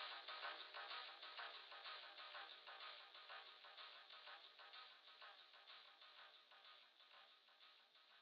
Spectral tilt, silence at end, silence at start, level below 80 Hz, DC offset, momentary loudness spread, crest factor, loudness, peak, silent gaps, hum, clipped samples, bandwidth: 6.5 dB/octave; 0 s; 0 s; under -90 dBFS; under 0.1%; 14 LU; 20 dB; -57 LUFS; -40 dBFS; none; none; under 0.1%; 6.2 kHz